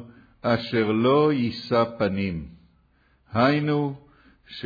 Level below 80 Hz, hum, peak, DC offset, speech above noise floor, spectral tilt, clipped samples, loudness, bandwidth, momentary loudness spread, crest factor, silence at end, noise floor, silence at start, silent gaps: -54 dBFS; none; -10 dBFS; under 0.1%; 40 dB; -8.5 dB/octave; under 0.1%; -23 LUFS; 5 kHz; 14 LU; 16 dB; 0 s; -62 dBFS; 0 s; none